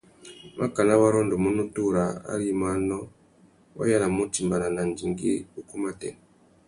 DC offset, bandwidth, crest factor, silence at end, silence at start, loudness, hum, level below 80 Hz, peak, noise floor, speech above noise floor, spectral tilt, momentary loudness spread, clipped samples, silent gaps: under 0.1%; 11.5 kHz; 20 dB; 0.55 s; 0.25 s; -26 LUFS; none; -54 dBFS; -6 dBFS; -58 dBFS; 33 dB; -6 dB/octave; 15 LU; under 0.1%; none